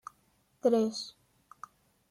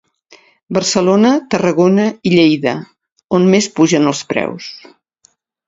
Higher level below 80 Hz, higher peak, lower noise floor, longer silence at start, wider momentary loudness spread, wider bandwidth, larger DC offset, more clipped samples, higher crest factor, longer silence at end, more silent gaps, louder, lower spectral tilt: second, -78 dBFS vs -56 dBFS; second, -14 dBFS vs 0 dBFS; first, -70 dBFS vs -56 dBFS; about the same, 0.65 s vs 0.7 s; first, 24 LU vs 9 LU; first, 14.5 kHz vs 8 kHz; neither; neither; first, 20 dB vs 14 dB; about the same, 1 s vs 0.9 s; second, none vs 3.12-3.16 s, 3.24-3.28 s; second, -30 LUFS vs -13 LUFS; about the same, -5 dB/octave vs -5 dB/octave